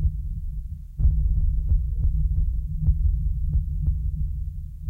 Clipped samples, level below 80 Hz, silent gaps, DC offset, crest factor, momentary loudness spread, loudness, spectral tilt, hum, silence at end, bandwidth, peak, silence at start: under 0.1%; -24 dBFS; none; under 0.1%; 14 dB; 10 LU; -27 LUFS; -11.5 dB/octave; none; 0 s; 0.7 kHz; -10 dBFS; 0 s